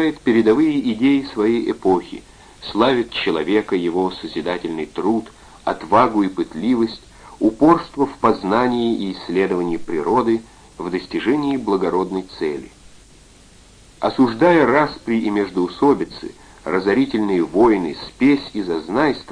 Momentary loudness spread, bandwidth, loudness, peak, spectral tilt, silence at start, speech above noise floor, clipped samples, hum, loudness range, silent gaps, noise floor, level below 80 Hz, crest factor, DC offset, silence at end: 10 LU; 10.5 kHz; -19 LUFS; 0 dBFS; -6.5 dB/octave; 0 s; 29 dB; under 0.1%; none; 3 LU; none; -47 dBFS; -48 dBFS; 18 dB; under 0.1%; 0 s